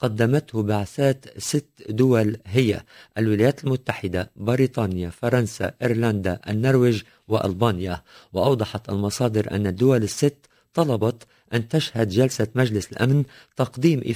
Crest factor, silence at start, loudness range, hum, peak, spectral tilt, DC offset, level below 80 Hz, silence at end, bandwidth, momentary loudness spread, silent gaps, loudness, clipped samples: 18 dB; 0 s; 1 LU; none; -4 dBFS; -6.5 dB/octave; under 0.1%; -46 dBFS; 0 s; 16 kHz; 8 LU; none; -23 LUFS; under 0.1%